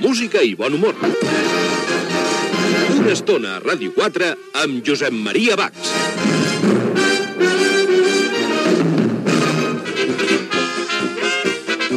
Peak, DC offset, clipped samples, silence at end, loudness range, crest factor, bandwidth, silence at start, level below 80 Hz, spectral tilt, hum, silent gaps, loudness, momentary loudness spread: -2 dBFS; under 0.1%; under 0.1%; 0 s; 2 LU; 14 dB; 14 kHz; 0 s; -68 dBFS; -4 dB/octave; none; none; -17 LUFS; 5 LU